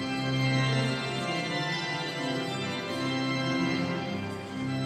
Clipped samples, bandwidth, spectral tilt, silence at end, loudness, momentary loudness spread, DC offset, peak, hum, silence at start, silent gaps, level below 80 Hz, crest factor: under 0.1%; 13 kHz; -5.5 dB/octave; 0 s; -30 LUFS; 7 LU; under 0.1%; -16 dBFS; none; 0 s; none; -62 dBFS; 14 dB